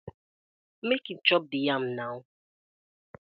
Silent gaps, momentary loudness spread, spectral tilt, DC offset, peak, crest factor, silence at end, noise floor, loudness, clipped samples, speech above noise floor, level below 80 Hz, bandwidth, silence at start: 0.14-0.82 s; 13 LU; -7.5 dB/octave; under 0.1%; -6 dBFS; 26 dB; 1.1 s; under -90 dBFS; -28 LUFS; under 0.1%; over 62 dB; -70 dBFS; 5.6 kHz; 0.05 s